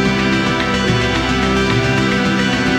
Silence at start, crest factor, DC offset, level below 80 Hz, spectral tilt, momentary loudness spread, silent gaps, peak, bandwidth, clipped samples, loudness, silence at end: 0 s; 14 dB; under 0.1%; -30 dBFS; -5 dB/octave; 1 LU; none; -2 dBFS; 15.5 kHz; under 0.1%; -15 LUFS; 0 s